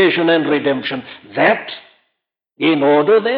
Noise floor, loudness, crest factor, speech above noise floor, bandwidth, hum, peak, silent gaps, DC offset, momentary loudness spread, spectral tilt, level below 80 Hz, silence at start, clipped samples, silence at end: -75 dBFS; -15 LUFS; 14 dB; 60 dB; 5.4 kHz; none; -2 dBFS; none; under 0.1%; 15 LU; -9 dB/octave; -66 dBFS; 0 s; under 0.1%; 0 s